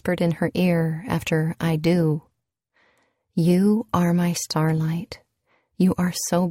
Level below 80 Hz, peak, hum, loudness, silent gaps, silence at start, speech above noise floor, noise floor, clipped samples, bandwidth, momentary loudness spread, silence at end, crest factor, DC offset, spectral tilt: -54 dBFS; -6 dBFS; none; -22 LUFS; none; 0.05 s; 51 dB; -72 dBFS; under 0.1%; 16 kHz; 7 LU; 0 s; 16 dB; under 0.1%; -6 dB/octave